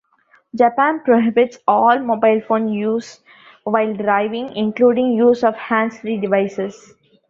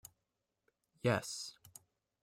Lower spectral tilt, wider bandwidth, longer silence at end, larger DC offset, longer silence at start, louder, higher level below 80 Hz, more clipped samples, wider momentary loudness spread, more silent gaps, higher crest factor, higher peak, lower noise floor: first, -6.5 dB/octave vs -4.5 dB/octave; second, 7.4 kHz vs 16 kHz; about the same, 0.55 s vs 0.55 s; neither; second, 0.55 s vs 1.05 s; first, -17 LUFS vs -38 LUFS; first, -64 dBFS vs -74 dBFS; neither; second, 9 LU vs 23 LU; neither; second, 16 dB vs 24 dB; first, -2 dBFS vs -20 dBFS; second, -56 dBFS vs -87 dBFS